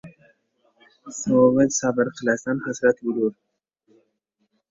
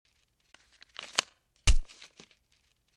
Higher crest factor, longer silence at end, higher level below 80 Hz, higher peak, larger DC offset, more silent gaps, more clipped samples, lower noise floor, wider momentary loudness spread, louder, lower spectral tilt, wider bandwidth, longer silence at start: second, 20 dB vs 28 dB; first, 1.4 s vs 1.1 s; second, -62 dBFS vs -34 dBFS; about the same, -4 dBFS vs -6 dBFS; neither; neither; neither; about the same, -73 dBFS vs -72 dBFS; second, 10 LU vs 22 LU; first, -21 LUFS vs -32 LUFS; first, -5 dB/octave vs -2 dB/octave; second, 7.8 kHz vs 11.5 kHz; second, 0.05 s vs 1 s